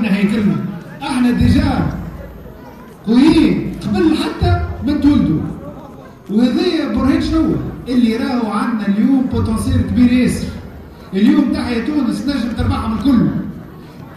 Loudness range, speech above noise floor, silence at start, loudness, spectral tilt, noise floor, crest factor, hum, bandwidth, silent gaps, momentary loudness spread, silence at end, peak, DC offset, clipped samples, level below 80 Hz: 2 LU; 22 dB; 0 s; -15 LUFS; -7 dB/octave; -35 dBFS; 14 dB; none; 13 kHz; none; 20 LU; 0 s; 0 dBFS; under 0.1%; under 0.1%; -30 dBFS